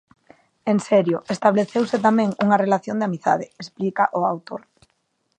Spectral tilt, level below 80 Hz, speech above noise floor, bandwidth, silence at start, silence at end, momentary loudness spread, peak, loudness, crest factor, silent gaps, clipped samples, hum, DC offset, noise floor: -6.5 dB/octave; -68 dBFS; 50 dB; 9.4 kHz; 0.65 s; 0.8 s; 11 LU; -2 dBFS; -21 LUFS; 18 dB; none; under 0.1%; none; under 0.1%; -70 dBFS